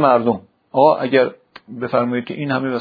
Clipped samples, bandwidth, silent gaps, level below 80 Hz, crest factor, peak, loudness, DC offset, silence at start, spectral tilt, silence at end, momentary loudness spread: under 0.1%; 5 kHz; none; -64 dBFS; 18 dB; 0 dBFS; -18 LUFS; under 0.1%; 0 s; -9.5 dB/octave; 0 s; 11 LU